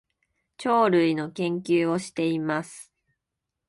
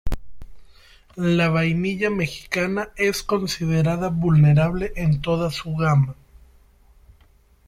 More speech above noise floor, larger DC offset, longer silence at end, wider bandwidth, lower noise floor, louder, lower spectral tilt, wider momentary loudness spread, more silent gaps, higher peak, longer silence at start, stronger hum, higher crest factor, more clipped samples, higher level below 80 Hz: first, 60 dB vs 35 dB; neither; second, 0.85 s vs 1.55 s; second, 11.5 kHz vs 14.5 kHz; first, -84 dBFS vs -55 dBFS; second, -25 LUFS vs -21 LUFS; about the same, -6 dB/octave vs -6.5 dB/octave; about the same, 11 LU vs 9 LU; neither; about the same, -8 dBFS vs -6 dBFS; first, 0.6 s vs 0.05 s; neither; about the same, 18 dB vs 16 dB; neither; second, -70 dBFS vs -38 dBFS